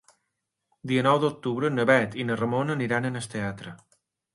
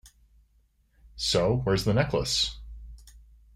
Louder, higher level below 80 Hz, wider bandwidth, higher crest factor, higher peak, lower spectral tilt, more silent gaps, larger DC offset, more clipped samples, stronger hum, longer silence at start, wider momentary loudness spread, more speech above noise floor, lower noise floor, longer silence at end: about the same, -25 LUFS vs -26 LUFS; second, -64 dBFS vs -44 dBFS; second, 11.5 kHz vs 16 kHz; about the same, 20 dB vs 20 dB; first, -6 dBFS vs -10 dBFS; first, -6 dB/octave vs -4.5 dB/octave; neither; neither; neither; neither; second, 0.85 s vs 1.15 s; second, 12 LU vs 21 LU; first, 56 dB vs 40 dB; first, -81 dBFS vs -66 dBFS; first, 0.6 s vs 0.4 s